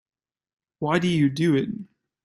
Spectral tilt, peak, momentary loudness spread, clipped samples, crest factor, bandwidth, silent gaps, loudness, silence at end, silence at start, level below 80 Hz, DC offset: -7 dB/octave; -8 dBFS; 11 LU; under 0.1%; 18 dB; 12 kHz; none; -23 LUFS; 0.4 s; 0.8 s; -62 dBFS; under 0.1%